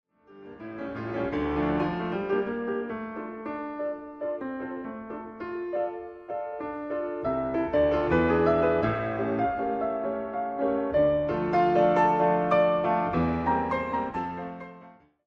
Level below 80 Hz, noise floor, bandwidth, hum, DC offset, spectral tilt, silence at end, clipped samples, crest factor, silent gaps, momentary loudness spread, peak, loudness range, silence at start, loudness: -52 dBFS; -52 dBFS; 6.4 kHz; none; under 0.1%; -8.5 dB/octave; 0.35 s; under 0.1%; 18 dB; none; 14 LU; -10 dBFS; 10 LU; 0.3 s; -27 LUFS